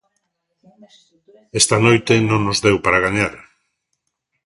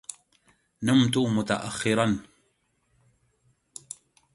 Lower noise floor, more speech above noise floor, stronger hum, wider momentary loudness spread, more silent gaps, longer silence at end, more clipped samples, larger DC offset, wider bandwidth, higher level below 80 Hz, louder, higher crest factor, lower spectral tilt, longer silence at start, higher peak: about the same, -74 dBFS vs -71 dBFS; first, 57 dB vs 47 dB; neither; second, 7 LU vs 22 LU; neither; second, 1.05 s vs 2.1 s; neither; neither; about the same, 11.5 kHz vs 11.5 kHz; first, -46 dBFS vs -60 dBFS; first, -16 LUFS vs -25 LUFS; about the same, 18 dB vs 20 dB; about the same, -4 dB/octave vs -5 dB/octave; first, 1.55 s vs 0.8 s; first, 0 dBFS vs -8 dBFS